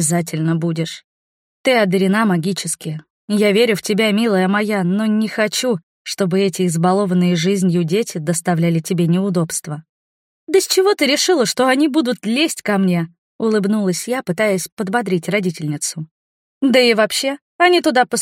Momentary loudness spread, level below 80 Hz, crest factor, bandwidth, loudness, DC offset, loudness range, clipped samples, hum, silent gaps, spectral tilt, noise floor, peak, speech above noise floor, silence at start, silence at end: 9 LU; -66 dBFS; 16 dB; 16.5 kHz; -17 LUFS; under 0.1%; 3 LU; under 0.1%; none; 1.04-1.64 s, 3.10-3.28 s, 5.83-6.05 s, 9.89-10.47 s, 13.18-13.39 s, 14.72-14.77 s, 16.11-16.61 s, 17.41-17.59 s; -4.5 dB/octave; under -90 dBFS; 0 dBFS; over 74 dB; 0 s; 0 s